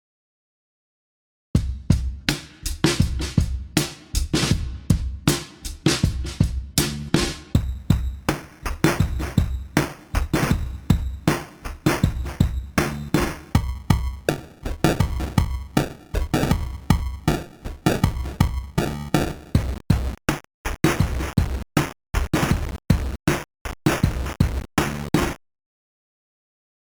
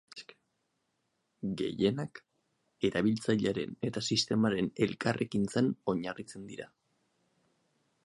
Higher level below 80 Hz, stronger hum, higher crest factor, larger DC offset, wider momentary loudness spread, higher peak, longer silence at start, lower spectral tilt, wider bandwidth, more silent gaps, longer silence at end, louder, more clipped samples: first, -30 dBFS vs -66 dBFS; neither; about the same, 20 dB vs 20 dB; neither; second, 6 LU vs 15 LU; first, -4 dBFS vs -14 dBFS; first, 1.55 s vs 0.15 s; about the same, -5.5 dB/octave vs -5.5 dB/octave; first, over 20 kHz vs 11.5 kHz; first, 20.54-20.64 s, 23.61-23.65 s vs none; first, 1.6 s vs 1.4 s; first, -24 LUFS vs -32 LUFS; neither